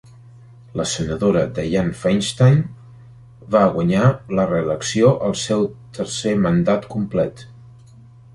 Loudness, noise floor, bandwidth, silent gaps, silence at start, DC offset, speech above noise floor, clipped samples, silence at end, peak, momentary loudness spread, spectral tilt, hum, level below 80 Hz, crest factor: -19 LUFS; -44 dBFS; 11.5 kHz; none; 0.75 s; under 0.1%; 27 dB; under 0.1%; 0.8 s; -2 dBFS; 9 LU; -6 dB/octave; none; -46 dBFS; 18 dB